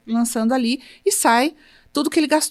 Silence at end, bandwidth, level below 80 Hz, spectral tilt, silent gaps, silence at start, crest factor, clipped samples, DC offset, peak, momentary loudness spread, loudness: 0 s; 16 kHz; -60 dBFS; -2.5 dB/octave; none; 0.05 s; 18 dB; under 0.1%; under 0.1%; -2 dBFS; 8 LU; -19 LUFS